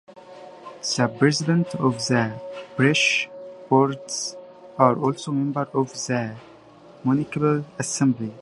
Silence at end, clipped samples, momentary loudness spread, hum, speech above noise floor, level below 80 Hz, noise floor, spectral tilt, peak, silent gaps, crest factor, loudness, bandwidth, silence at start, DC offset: 0 s; under 0.1%; 18 LU; none; 26 dB; -64 dBFS; -48 dBFS; -5 dB/octave; -2 dBFS; none; 22 dB; -23 LUFS; 11.5 kHz; 0.1 s; under 0.1%